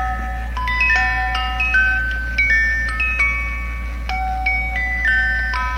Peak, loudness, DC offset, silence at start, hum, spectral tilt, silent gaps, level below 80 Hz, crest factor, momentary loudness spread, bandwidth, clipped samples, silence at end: -6 dBFS; -18 LUFS; under 0.1%; 0 s; none; -4 dB/octave; none; -24 dBFS; 14 dB; 10 LU; 12.5 kHz; under 0.1%; 0 s